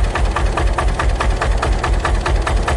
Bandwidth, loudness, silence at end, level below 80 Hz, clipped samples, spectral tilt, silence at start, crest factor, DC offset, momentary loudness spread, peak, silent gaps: 11.5 kHz; -18 LUFS; 0 s; -18 dBFS; under 0.1%; -5 dB/octave; 0 s; 12 dB; under 0.1%; 1 LU; -4 dBFS; none